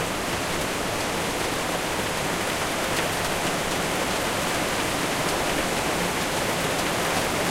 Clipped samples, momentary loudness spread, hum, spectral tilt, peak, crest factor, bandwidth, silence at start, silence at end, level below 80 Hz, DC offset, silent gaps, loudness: under 0.1%; 2 LU; none; -3 dB/octave; -10 dBFS; 16 dB; 16 kHz; 0 s; 0 s; -44 dBFS; under 0.1%; none; -25 LUFS